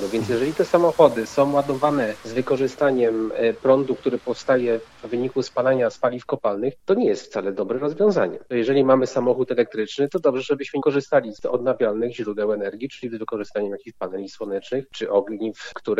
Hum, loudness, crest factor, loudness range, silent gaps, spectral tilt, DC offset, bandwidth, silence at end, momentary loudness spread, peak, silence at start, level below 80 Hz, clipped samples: none; -22 LUFS; 20 dB; 6 LU; none; -6 dB/octave; under 0.1%; 13.5 kHz; 0 s; 11 LU; -2 dBFS; 0 s; -62 dBFS; under 0.1%